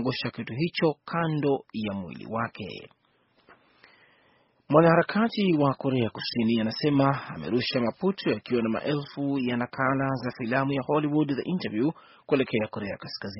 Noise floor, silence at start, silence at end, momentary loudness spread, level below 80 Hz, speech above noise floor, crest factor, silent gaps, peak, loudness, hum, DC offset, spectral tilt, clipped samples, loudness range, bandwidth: -66 dBFS; 0 s; 0 s; 9 LU; -62 dBFS; 40 dB; 22 dB; none; -6 dBFS; -27 LUFS; none; under 0.1%; -5 dB/octave; under 0.1%; 7 LU; 6 kHz